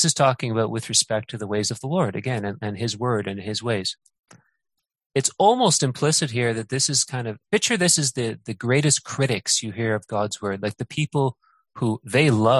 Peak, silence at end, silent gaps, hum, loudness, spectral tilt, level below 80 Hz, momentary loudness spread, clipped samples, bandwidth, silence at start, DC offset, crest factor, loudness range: -2 dBFS; 0 s; 4.20-4.24 s, 5.06-5.10 s; none; -22 LUFS; -3.5 dB/octave; -58 dBFS; 10 LU; under 0.1%; 12.5 kHz; 0 s; under 0.1%; 20 dB; 6 LU